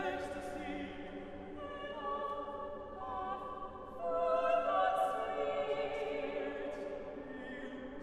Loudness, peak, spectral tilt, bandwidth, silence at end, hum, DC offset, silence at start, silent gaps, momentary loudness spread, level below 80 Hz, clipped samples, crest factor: -39 LUFS; -20 dBFS; -5.5 dB/octave; 13 kHz; 0 s; none; under 0.1%; 0 s; none; 14 LU; -60 dBFS; under 0.1%; 18 dB